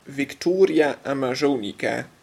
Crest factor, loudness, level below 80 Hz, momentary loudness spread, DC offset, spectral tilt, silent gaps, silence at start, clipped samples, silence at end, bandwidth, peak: 16 dB; -22 LUFS; -66 dBFS; 8 LU; under 0.1%; -5.5 dB/octave; none; 0.05 s; under 0.1%; 0.15 s; 14 kHz; -6 dBFS